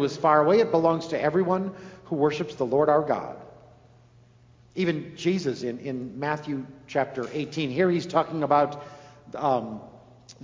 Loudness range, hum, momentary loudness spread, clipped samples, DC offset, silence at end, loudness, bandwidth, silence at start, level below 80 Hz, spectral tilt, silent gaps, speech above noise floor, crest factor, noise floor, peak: 7 LU; none; 15 LU; under 0.1%; under 0.1%; 0.1 s; -25 LUFS; 7.6 kHz; 0 s; -64 dBFS; -6.5 dB/octave; none; 31 dB; 20 dB; -56 dBFS; -6 dBFS